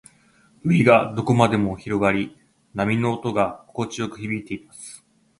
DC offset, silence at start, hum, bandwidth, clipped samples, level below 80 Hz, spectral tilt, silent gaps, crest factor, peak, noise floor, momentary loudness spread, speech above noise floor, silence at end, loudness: under 0.1%; 0.65 s; none; 11.5 kHz; under 0.1%; -52 dBFS; -6.5 dB/octave; none; 22 dB; 0 dBFS; -57 dBFS; 17 LU; 36 dB; 0.45 s; -21 LUFS